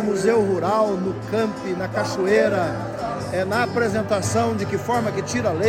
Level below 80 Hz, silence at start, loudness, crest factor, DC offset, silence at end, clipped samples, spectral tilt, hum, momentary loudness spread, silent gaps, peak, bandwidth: -52 dBFS; 0 s; -22 LUFS; 16 dB; under 0.1%; 0 s; under 0.1%; -5.5 dB/octave; none; 7 LU; none; -4 dBFS; 16 kHz